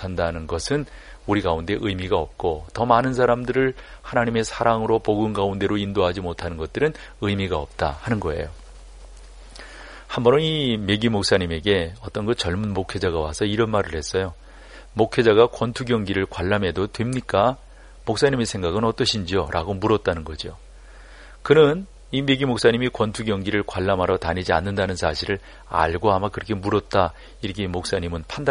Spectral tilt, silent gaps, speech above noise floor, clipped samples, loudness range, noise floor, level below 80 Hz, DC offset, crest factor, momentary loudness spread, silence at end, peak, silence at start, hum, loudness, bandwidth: -5.5 dB/octave; none; 21 dB; under 0.1%; 4 LU; -43 dBFS; -40 dBFS; under 0.1%; 20 dB; 11 LU; 0 s; -2 dBFS; 0 s; none; -22 LUFS; 11 kHz